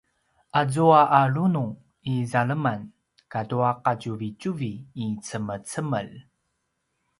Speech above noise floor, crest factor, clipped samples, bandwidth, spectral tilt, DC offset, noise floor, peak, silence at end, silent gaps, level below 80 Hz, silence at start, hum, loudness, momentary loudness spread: 53 dB; 22 dB; under 0.1%; 11.5 kHz; -6.5 dB/octave; under 0.1%; -76 dBFS; -4 dBFS; 1 s; none; -64 dBFS; 0.55 s; none; -24 LUFS; 15 LU